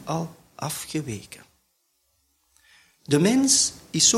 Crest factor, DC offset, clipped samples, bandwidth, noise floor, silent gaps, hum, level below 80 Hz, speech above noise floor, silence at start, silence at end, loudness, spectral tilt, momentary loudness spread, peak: 20 dB; under 0.1%; under 0.1%; 16 kHz; -70 dBFS; none; none; -60 dBFS; 48 dB; 0 s; 0 s; -22 LUFS; -3 dB/octave; 19 LU; -6 dBFS